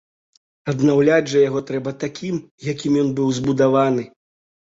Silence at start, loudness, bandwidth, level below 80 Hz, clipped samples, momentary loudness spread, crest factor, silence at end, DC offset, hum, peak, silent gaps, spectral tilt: 0.65 s; -19 LUFS; 7.8 kHz; -58 dBFS; under 0.1%; 11 LU; 16 dB; 0.7 s; under 0.1%; none; -4 dBFS; 2.51-2.58 s; -6.5 dB/octave